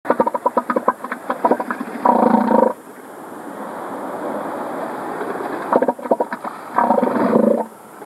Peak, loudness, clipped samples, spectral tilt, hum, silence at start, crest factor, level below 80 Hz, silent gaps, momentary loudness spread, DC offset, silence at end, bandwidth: 0 dBFS; -19 LUFS; under 0.1%; -7 dB/octave; none; 0.05 s; 18 dB; -72 dBFS; none; 15 LU; under 0.1%; 0 s; 14 kHz